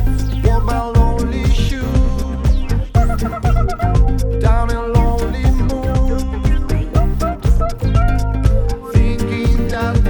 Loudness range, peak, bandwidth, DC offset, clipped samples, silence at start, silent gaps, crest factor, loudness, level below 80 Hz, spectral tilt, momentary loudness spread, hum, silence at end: 1 LU; 0 dBFS; 19.5 kHz; under 0.1%; under 0.1%; 0 s; none; 14 dB; -17 LUFS; -16 dBFS; -7.5 dB/octave; 3 LU; none; 0 s